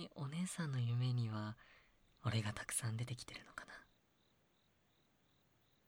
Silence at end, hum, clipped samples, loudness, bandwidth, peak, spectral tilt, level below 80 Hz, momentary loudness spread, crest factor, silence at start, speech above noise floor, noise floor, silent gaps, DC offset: 2.05 s; none; under 0.1%; -43 LUFS; 16 kHz; -26 dBFS; -5 dB/octave; -72 dBFS; 15 LU; 18 dB; 0 s; 35 dB; -77 dBFS; none; under 0.1%